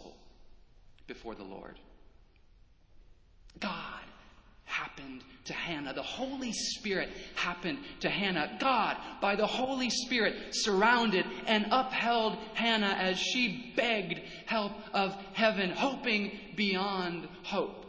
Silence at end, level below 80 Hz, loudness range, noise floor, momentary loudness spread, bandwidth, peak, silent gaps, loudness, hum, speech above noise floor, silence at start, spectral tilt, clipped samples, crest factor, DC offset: 0 s; -62 dBFS; 16 LU; -60 dBFS; 14 LU; 8 kHz; -10 dBFS; none; -31 LUFS; none; 28 dB; 0 s; -3.5 dB/octave; under 0.1%; 22 dB; under 0.1%